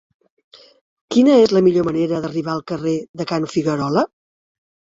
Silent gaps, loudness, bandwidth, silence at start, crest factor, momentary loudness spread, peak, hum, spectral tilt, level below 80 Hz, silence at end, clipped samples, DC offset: 3.09-3.14 s; -18 LUFS; 7.8 kHz; 1.1 s; 16 dB; 12 LU; -2 dBFS; none; -6.5 dB/octave; -56 dBFS; 0.85 s; under 0.1%; under 0.1%